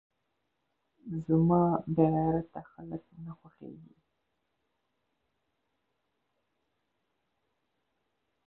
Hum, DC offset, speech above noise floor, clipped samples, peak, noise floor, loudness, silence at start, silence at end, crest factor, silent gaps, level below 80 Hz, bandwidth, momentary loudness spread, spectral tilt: none; under 0.1%; 51 dB; under 0.1%; -12 dBFS; -81 dBFS; -28 LUFS; 1.05 s; 4.7 s; 22 dB; none; -62 dBFS; 2.9 kHz; 24 LU; -12.5 dB/octave